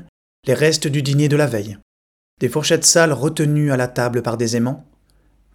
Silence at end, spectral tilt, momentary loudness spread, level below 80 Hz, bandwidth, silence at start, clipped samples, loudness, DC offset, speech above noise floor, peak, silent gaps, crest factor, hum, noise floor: 0.75 s; -4.5 dB/octave; 12 LU; -54 dBFS; 18.5 kHz; 0.45 s; under 0.1%; -17 LUFS; under 0.1%; 39 dB; 0 dBFS; 1.82-2.37 s; 18 dB; none; -56 dBFS